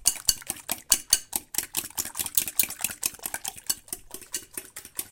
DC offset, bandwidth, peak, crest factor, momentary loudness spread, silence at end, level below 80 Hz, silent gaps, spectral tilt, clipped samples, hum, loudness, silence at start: under 0.1%; 17 kHz; 0 dBFS; 30 dB; 13 LU; 0 s; -54 dBFS; none; 1 dB/octave; under 0.1%; none; -27 LUFS; 0 s